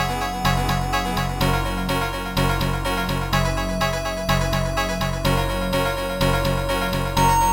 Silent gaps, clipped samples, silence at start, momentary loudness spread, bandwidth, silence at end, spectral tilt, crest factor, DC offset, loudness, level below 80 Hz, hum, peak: none; under 0.1%; 0 s; 3 LU; 17 kHz; 0 s; -4.5 dB/octave; 16 dB; 0.1%; -22 LUFS; -28 dBFS; none; -6 dBFS